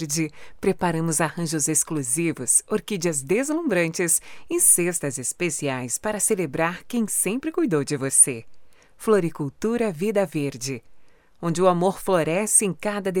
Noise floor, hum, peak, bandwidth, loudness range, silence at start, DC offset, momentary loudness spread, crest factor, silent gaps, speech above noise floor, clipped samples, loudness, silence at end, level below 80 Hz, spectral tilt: -47 dBFS; none; -4 dBFS; over 20 kHz; 3 LU; 0 s; under 0.1%; 10 LU; 20 dB; none; 24 dB; under 0.1%; -22 LUFS; 0 s; -58 dBFS; -4 dB/octave